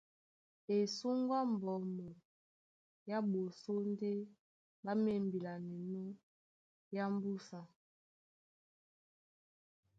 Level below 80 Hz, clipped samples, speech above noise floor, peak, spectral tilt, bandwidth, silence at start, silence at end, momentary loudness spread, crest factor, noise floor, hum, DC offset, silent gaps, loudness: -84 dBFS; under 0.1%; over 51 dB; -26 dBFS; -7 dB/octave; 7.8 kHz; 0.7 s; 2.35 s; 17 LU; 16 dB; under -90 dBFS; none; under 0.1%; 2.25-3.06 s, 4.39-4.83 s, 6.23-6.91 s; -40 LUFS